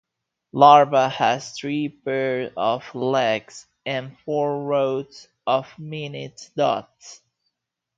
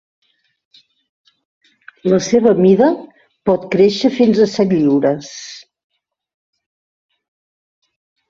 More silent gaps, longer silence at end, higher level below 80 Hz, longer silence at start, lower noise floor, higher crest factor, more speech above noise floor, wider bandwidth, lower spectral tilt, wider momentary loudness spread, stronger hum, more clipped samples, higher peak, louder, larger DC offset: neither; second, 0.8 s vs 2.7 s; second, -70 dBFS vs -58 dBFS; second, 0.55 s vs 2.05 s; second, -79 dBFS vs under -90 dBFS; first, 22 dB vs 16 dB; second, 58 dB vs over 77 dB; about the same, 7.8 kHz vs 7.6 kHz; second, -5 dB/octave vs -6.5 dB/octave; about the same, 18 LU vs 16 LU; neither; neither; about the same, 0 dBFS vs -2 dBFS; second, -21 LUFS vs -14 LUFS; neither